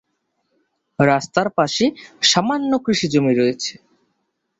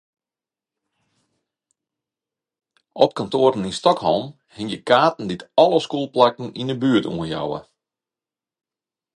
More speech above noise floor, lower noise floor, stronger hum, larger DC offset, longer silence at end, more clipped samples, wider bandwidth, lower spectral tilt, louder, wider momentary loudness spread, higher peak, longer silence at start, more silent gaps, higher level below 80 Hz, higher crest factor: second, 54 dB vs over 71 dB; second, -72 dBFS vs under -90 dBFS; neither; neither; second, 0.9 s vs 1.55 s; neither; second, 8 kHz vs 11 kHz; second, -4 dB/octave vs -5.5 dB/octave; about the same, -18 LUFS vs -20 LUFS; second, 6 LU vs 12 LU; about the same, -2 dBFS vs 0 dBFS; second, 1 s vs 2.95 s; neither; about the same, -58 dBFS vs -58 dBFS; about the same, 18 dB vs 22 dB